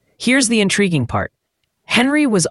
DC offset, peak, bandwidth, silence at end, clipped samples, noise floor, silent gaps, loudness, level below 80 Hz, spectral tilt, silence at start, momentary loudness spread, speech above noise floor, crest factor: under 0.1%; -2 dBFS; 12 kHz; 0 s; under 0.1%; -71 dBFS; none; -16 LUFS; -46 dBFS; -4 dB/octave; 0.2 s; 9 LU; 56 dB; 16 dB